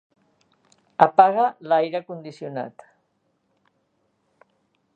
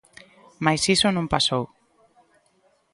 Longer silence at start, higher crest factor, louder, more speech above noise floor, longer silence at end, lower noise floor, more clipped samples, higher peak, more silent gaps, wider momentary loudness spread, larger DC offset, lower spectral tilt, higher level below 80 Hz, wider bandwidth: first, 1 s vs 0.6 s; about the same, 24 dB vs 22 dB; about the same, -20 LUFS vs -21 LUFS; first, 50 dB vs 42 dB; first, 2.25 s vs 1.25 s; first, -70 dBFS vs -64 dBFS; neither; first, 0 dBFS vs -4 dBFS; neither; first, 22 LU vs 9 LU; neither; first, -7 dB/octave vs -3.5 dB/octave; second, -70 dBFS vs -52 dBFS; second, 7.6 kHz vs 11.5 kHz